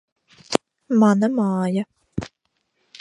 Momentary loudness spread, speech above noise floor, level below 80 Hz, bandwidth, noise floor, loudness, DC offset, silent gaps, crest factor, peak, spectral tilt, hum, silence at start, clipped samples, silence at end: 16 LU; 54 dB; -54 dBFS; 11.5 kHz; -72 dBFS; -21 LUFS; under 0.1%; none; 22 dB; 0 dBFS; -6.5 dB/octave; none; 0.5 s; under 0.1%; 0.75 s